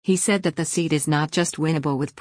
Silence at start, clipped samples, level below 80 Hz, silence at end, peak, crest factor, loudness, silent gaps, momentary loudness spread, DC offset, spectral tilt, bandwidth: 0.05 s; under 0.1%; -60 dBFS; 0.1 s; -8 dBFS; 14 dB; -22 LUFS; none; 4 LU; under 0.1%; -4.5 dB/octave; 10.5 kHz